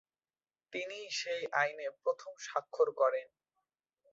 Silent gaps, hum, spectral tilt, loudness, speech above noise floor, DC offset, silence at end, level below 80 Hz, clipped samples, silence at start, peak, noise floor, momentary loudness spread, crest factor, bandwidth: none; none; 0.5 dB/octave; -35 LUFS; over 55 dB; under 0.1%; 0.85 s; -88 dBFS; under 0.1%; 0.7 s; -16 dBFS; under -90 dBFS; 10 LU; 20 dB; 7.6 kHz